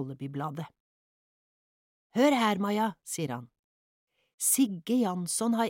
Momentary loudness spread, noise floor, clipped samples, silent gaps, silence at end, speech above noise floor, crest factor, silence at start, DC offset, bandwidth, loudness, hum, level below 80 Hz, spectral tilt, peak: 13 LU; under -90 dBFS; under 0.1%; 0.80-2.10 s, 3.59-4.07 s, 4.34-4.38 s; 0 s; over 61 dB; 18 dB; 0 s; under 0.1%; 17 kHz; -29 LUFS; none; -78 dBFS; -4 dB/octave; -12 dBFS